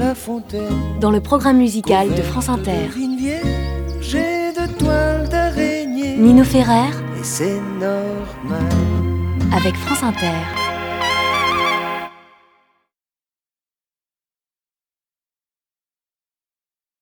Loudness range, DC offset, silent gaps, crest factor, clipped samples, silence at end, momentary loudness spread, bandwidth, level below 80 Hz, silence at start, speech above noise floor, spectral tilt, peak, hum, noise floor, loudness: 6 LU; under 0.1%; none; 18 dB; under 0.1%; 4.9 s; 9 LU; over 20 kHz; -32 dBFS; 0 s; over 74 dB; -5.5 dB/octave; 0 dBFS; none; under -90 dBFS; -18 LUFS